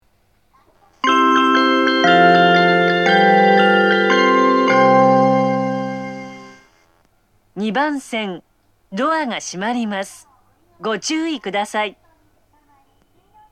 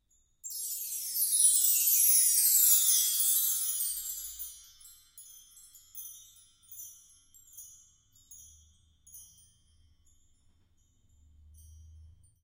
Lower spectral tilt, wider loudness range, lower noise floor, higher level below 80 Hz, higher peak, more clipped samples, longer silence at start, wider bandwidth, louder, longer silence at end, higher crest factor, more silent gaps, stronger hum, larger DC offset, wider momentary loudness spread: first, -5 dB/octave vs 4.5 dB/octave; second, 12 LU vs 26 LU; second, -60 dBFS vs -68 dBFS; about the same, -64 dBFS vs -66 dBFS; first, 0 dBFS vs -10 dBFS; neither; first, 1.05 s vs 0.45 s; second, 13.5 kHz vs 16.5 kHz; first, -15 LUFS vs -24 LUFS; first, 1.6 s vs 0.35 s; second, 16 dB vs 22 dB; neither; neither; neither; second, 15 LU vs 25 LU